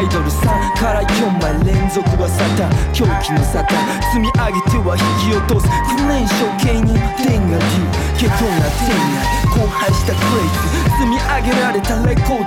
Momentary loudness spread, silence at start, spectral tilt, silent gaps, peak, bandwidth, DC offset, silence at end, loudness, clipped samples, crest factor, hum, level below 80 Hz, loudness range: 1 LU; 0 s; -5.5 dB/octave; none; -2 dBFS; 17 kHz; under 0.1%; 0 s; -15 LUFS; under 0.1%; 12 dB; none; -22 dBFS; 0 LU